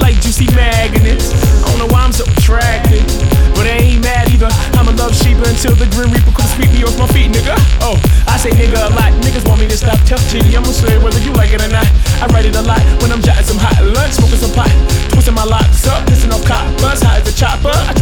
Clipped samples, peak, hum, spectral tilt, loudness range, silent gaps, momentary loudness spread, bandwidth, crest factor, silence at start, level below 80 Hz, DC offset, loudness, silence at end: under 0.1%; 0 dBFS; none; -5 dB/octave; 0 LU; none; 1 LU; 20 kHz; 8 dB; 0 s; -10 dBFS; under 0.1%; -11 LUFS; 0 s